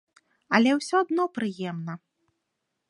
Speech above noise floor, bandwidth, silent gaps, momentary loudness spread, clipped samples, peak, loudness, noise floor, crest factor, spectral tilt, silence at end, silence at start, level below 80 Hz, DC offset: 56 dB; 11 kHz; none; 15 LU; under 0.1%; -4 dBFS; -25 LUFS; -80 dBFS; 24 dB; -5 dB/octave; 0.9 s; 0.5 s; -78 dBFS; under 0.1%